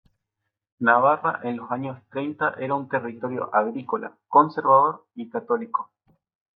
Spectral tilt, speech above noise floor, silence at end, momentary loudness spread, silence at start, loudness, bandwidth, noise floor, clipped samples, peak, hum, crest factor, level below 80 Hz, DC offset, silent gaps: -10 dB/octave; 59 dB; 0.7 s; 13 LU; 0.8 s; -23 LUFS; 5.2 kHz; -82 dBFS; under 0.1%; -4 dBFS; none; 20 dB; -78 dBFS; under 0.1%; none